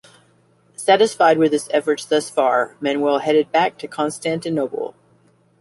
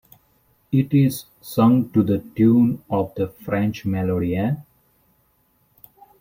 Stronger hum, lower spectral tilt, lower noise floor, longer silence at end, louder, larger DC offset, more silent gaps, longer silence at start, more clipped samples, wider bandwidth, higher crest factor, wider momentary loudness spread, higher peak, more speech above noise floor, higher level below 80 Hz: neither; second, -4 dB/octave vs -8 dB/octave; second, -57 dBFS vs -63 dBFS; second, 0.7 s vs 1.6 s; about the same, -19 LUFS vs -21 LUFS; neither; neither; about the same, 0.8 s vs 0.7 s; neither; second, 11.5 kHz vs 16.5 kHz; about the same, 18 dB vs 16 dB; about the same, 10 LU vs 10 LU; first, -2 dBFS vs -6 dBFS; second, 39 dB vs 44 dB; second, -66 dBFS vs -54 dBFS